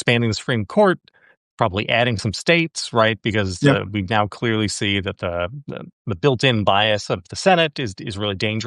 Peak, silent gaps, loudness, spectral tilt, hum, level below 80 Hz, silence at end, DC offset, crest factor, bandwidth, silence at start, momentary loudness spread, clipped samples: -2 dBFS; 1.37-1.58 s, 5.93-6.05 s; -20 LUFS; -5 dB/octave; none; -56 dBFS; 0 s; under 0.1%; 18 dB; 11.5 kHz; 0 s; 10 LU; under 0.1%